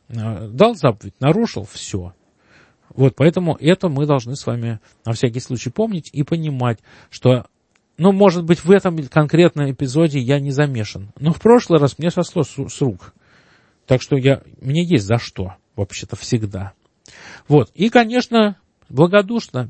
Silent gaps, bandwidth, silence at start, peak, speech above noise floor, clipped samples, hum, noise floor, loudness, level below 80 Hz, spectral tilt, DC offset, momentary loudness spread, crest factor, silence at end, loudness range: none; 8.8 kHz; 0.1 s; 0 dBFS; 38 dB; under 0.1%; none; -54 dBFS; -17 LUFS; -52 dBFS; -7 dB/octave; under 0.1%; 14 LU; 18 dB; 0 s; 5 LU